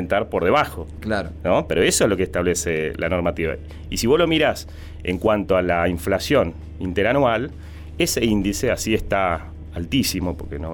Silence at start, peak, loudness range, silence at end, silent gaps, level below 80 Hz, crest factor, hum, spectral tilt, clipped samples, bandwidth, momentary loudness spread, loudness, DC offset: 0 s; -6 dBFS; 1 LU; 0 s; none; -36 dBFS; 16 dB; none; -4.5 dB/octave; under 0.1%; over 20 kHz; 12 LU; -21 LUFS; under 0.1%